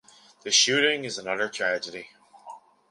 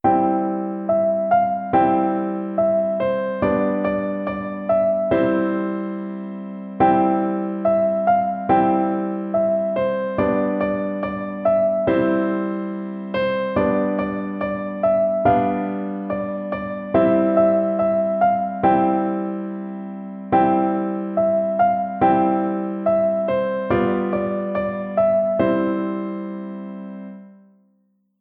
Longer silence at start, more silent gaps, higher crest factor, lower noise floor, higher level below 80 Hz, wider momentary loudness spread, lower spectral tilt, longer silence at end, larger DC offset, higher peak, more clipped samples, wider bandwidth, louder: first, 0.45 s vs 0.05 s; neither; first, 22 dB vs 16 dB; second, -47 dBFS vs -64 dBFS; second, -76 dBFS vs -52 dBFS; first, 19 LU vs 10 LU; second, -0.5 dB/octave vs -11 dB/octave; second, 0.35 s vs 0.9 s; neither; about the same, -6 dBFS vs -4 dBFS; neither; first, 11.5 kHz vs 4.5 kHz; second, -23 LUFS vs -20 LUFS